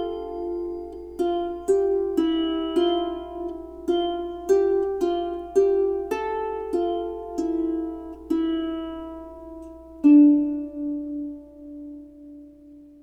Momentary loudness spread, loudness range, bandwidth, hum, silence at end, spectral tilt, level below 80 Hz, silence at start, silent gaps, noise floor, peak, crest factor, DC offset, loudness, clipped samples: 19 LU; 5 LU; 8.8 kHz; none; 0.15 s; -6 dB/octave; -50 dBFS; 0 s; none; -47 dBFS; -8 dBFS; 16 dB; under 0.1%; -24 LUFS; under 0.1%